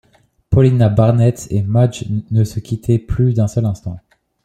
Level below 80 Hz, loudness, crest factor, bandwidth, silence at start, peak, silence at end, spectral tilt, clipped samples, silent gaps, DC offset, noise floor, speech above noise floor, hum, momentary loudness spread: -36 dBFS; -16 LUFS; 14 dB; 9.6 kHz; 0.5 s; -2 dBFS; 0.45 s; -8.5 dB/octave; under 0.1%; none; under 0.1%; -37 dBFS; 22 dB; none; 10 LU